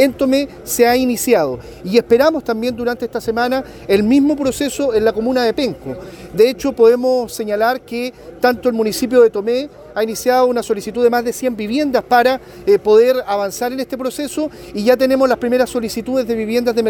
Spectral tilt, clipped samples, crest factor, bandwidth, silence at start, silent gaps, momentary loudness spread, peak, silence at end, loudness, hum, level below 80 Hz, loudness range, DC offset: -4.5 dB/octave; under 0.1%; 16 dB; 19 kHz; 0 s; none; 10 LU; 0 dBFS; 0 s; -16 LUFS; none; -46 dBFS; 2 LU; under 0.1%